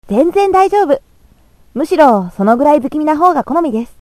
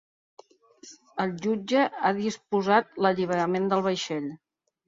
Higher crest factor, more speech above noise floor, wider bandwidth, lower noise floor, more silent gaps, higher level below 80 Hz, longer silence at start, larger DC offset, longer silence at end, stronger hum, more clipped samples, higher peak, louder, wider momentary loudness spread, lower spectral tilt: second, 12 dB vs 20 dB; first, 36 dB vs 27 dB; first, 14.5 kHz vs 7.8 kHz; second, -47 dBFS vs -53 dBFS; neither; first, -46 dBFS vs -70 dBFS; second, 0.1 s vs 0.85 s; neither; second, 0.15 s vs 0.5 s; neither; first, 0.2% vs under 0.1%; first, 0 dBFS vs -8 dBFS; first, -12 LUFS vs -26 LUFS; about the same, 8 LU vs 9 LU; first, -7 dB/octave vs -5.5 dB/octave